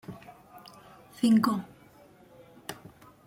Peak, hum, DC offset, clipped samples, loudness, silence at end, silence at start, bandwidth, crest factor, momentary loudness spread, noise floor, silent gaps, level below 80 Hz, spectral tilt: -12 dBFS; none; under 0.1%; under 0.1%; -26 LUFS; 0.55 s; 0.1 s; 16.5 kHz; 20 dB; 27 LU; -56 dBFS; none; -68 dBFS; -5.5 dB/octave